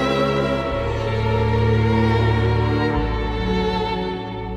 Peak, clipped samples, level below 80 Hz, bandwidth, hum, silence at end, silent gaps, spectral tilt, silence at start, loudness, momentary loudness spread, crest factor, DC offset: -6 dBFS; under 0.1%; -30 dBFS; 7.8 kHz; none; 0 s; none; -7.5 dB/octave; 0 s; -20 LUFS; 6 LU; 12 dB; under 0.1%